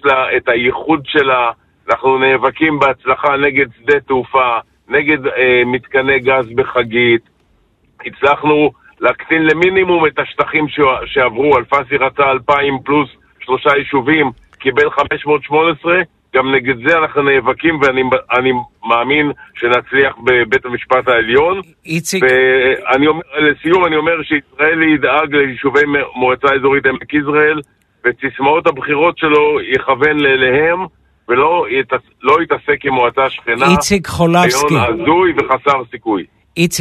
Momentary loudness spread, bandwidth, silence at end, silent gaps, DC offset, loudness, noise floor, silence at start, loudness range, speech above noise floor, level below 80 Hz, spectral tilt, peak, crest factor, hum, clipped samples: 6 LU; 13.5 kHz; 0 s; none; under 0.1%; -13 LUFS; -55 dBFS; 0.05 s; 2 LU; 42 dB; -46 dBFS; -4.5 dB/octave; 0 dBFS; 14 dB; none; under 0.1%